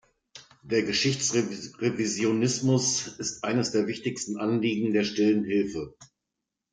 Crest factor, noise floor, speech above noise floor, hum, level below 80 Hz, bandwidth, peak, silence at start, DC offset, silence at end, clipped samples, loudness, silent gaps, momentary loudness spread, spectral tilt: 16 dB; -85 dBFS; 59 dB; none; -64 dBFS; 10 kHz; -12 dBFS; 0.35 s; under 0.1%; 0.7 s; under 0.1%; -26 LUFS; none; 8 LU; -4 dB/octave